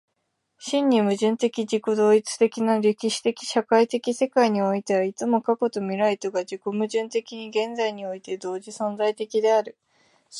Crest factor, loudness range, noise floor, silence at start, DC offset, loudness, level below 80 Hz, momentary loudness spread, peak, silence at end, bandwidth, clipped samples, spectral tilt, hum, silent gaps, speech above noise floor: 18 dB; 5 LU; -76 dBFS; 0.6 s; under 0.1%; -24 LUFS; -76 dBFS; 9 LU; -6 dBFS; 0 s; 11.5 kHz; under 0.1%; -4.5 dB/octave; none; none; 53 dB